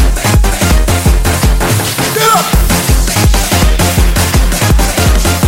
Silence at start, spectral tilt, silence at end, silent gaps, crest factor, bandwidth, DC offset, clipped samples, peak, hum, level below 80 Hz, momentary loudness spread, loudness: 0 s; -4 dB/octave; 0 s; none; 8 dB; 16.5 kHz; under 0.1%; under 0.1%; 0 dBFS; none; -12 dBFS; 2 LU; -10 LUFS